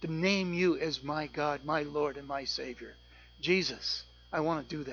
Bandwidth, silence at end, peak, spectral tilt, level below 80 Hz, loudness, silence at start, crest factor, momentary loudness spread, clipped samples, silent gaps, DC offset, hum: 7.2 kHz; 0 s; -14 dBFS; -5 dB/octave; -60 dBFS; -33 LUFS; 0 s; 20 dB; 9 LU; under 0.1%; none; under 0.1%; 60 Hz at -55 dBFS